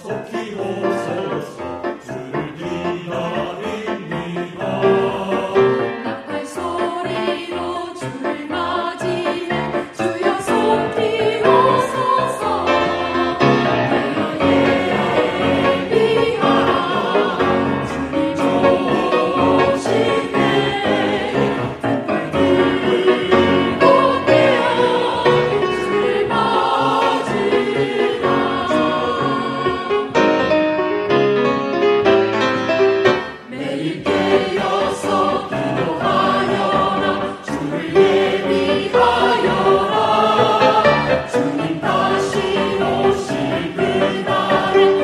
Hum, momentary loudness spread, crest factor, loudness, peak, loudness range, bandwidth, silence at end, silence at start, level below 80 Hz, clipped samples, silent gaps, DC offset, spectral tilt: none; 10 LU; 16 dB; -17 LUFS; 0 dBFS; 7 LU; 12.5 kHz; 0 s; 0 s; -48 dBFS; under 0.1%; none; under 0.1%; -5.5 dB/octave